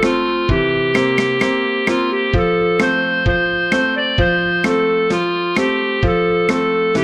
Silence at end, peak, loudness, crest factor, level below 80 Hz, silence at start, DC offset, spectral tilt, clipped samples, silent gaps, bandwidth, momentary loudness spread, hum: 0 s; -2 dBFS; -16 LUFS; 14 dB; -30 dBFS; 0 s; under 0.1%; -6 dB/octave; under 0.1%; none; 11 kHz; 2 LU; none